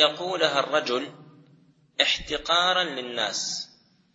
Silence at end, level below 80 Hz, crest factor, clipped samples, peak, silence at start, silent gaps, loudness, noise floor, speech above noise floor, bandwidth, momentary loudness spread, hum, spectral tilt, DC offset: 0.5 s; -56 dBFS; 22 dB; under 0.1%; -4 dBFS; 0 s; none; -24 LUFS; -59 dBFS; 33 dB; 8 kHz; 12 LU; none; -1.5 dB/octave; under 0.1%